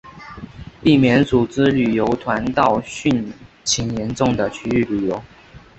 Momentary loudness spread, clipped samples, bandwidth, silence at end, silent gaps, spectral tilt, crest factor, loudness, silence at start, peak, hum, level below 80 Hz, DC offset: 18 LU; under 0.1%; 8.4 kHz; 0.2 s; none; -5 dB/octave; 18 dB; -18 LUFS; 0.05 s; -2 dBFS; none; -44 dBFS; under 0.1%